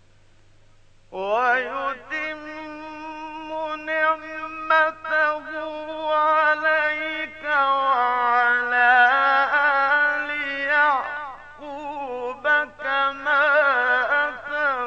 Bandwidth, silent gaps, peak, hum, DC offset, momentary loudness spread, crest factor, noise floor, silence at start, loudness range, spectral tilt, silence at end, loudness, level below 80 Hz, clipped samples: 7.6 kHz; none; -6 dBFS; none; under 0.1%; 15 LU; 18 dB; -52 dBFS; 1.1 s; 8 LU; -3.5 dB/octave; 0 s; -21 LUFS; -58 dBFS; under 0.1%